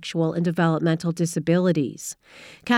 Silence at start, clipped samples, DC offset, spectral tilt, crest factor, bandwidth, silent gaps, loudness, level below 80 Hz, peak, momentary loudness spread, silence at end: 0 s; under 0.1%; under 0.1%; -6 dB/octave; 14 dB; 15 kHz; none; -23 LUFS; -64 dBFS; -8 dBFS; 14 LU; 0 s